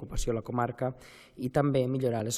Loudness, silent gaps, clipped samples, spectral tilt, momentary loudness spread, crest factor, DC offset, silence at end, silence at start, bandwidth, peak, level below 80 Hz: -31 LUFS; none; under 0.1%; -6 dB/octave; 12 LU; 18 dB; under 0.1%; 0 s; 0 s; 15 kHz; -12 dBFS; -42 dBFS